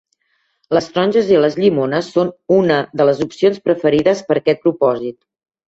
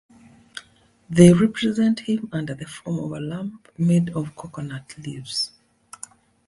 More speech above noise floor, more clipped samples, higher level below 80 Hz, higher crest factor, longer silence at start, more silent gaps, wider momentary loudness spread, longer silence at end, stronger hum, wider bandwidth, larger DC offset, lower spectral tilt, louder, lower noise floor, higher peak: first, 51 dB vs 34 dB; neither; about the same, -56 dBFS vs -54 dBFS; second, 16 dB vs 22 dB; first, 0.7 s vs 0.55 s; neither; second, 6 LU vs 25 LU; second, 0.55 s vs 1 s; neither; second, 8 kHz vs 11.5 kHz; neither; about the same, -6.5 dB/octave vs -6.5 dB/octave; first, -16 LUFS vs -21 LUFS; first, -65 dBFS vs -55 dBFS; about the same, 0 dBFS vs 0 dBFS